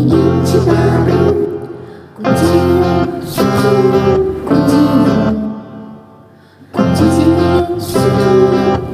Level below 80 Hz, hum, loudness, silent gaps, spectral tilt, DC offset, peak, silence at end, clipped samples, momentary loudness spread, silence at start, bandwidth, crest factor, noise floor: -34 dBFS; none; -12 LUFS; none; -7.5 dB/octave; under 0.1%; 0 dBFS; 0 s; under 0.1%; 11 LU; 0 s; 16 kHz; 12 dB; -41 dBFS